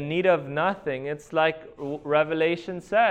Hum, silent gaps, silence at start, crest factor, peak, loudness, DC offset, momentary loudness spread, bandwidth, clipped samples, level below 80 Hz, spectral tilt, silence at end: none; none; 0 s; 16 dB; -8 dBFS; -25 LUFS; under 0.1%; 10 LU; 9.6 kHz; under 0.1%; -60 dBFS; -6.5 dB/octave; 0 s